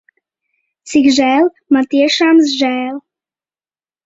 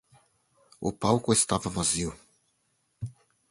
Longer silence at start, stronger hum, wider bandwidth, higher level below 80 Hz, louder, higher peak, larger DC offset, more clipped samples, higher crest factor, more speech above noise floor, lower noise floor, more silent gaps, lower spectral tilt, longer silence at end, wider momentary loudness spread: about the same, 0.85 s vs 0.8 s; neither; second, 8 kHz vs 11.5 kHz; second, -58 dBFS vs -52 dBFS; first, -12 LUFS vs -27 LUFS; first, 0 dBFS vs -8 dBFS; neither; neither; second, 14 dB vs 22 dB; first, over 78 dB vs 47 dB; first, under -90 dBFS vs -73 dBFS; neither; second, -2.5 dB/octave vs -4 dB/octave; first, 1.05 s vs 0.4 s; second, 9 LU vs 18 LU